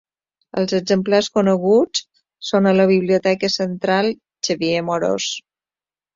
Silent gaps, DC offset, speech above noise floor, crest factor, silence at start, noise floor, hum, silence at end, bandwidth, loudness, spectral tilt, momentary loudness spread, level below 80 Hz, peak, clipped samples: none; under 0.1%; over 73 dB; 16 dB; 0.55 s; under -90 dBFS; none; 0.75 s; 7.6 kHz; -18 LUFS; -5 dB/octave; 10 LU; -60 dBFS; -4 dBFS; under 0.1%